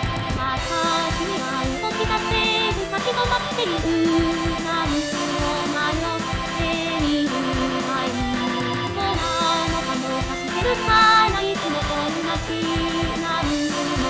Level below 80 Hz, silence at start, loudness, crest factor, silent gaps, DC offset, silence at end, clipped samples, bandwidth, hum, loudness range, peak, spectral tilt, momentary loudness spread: -36 dBFS; 0 s; -21 LUFS; 16 dB; none; under 0.1%; 0 s; under 0.1%; 8 kHz; none; 3 LU; -6 dBFS; -4 dB/octave; 5 LU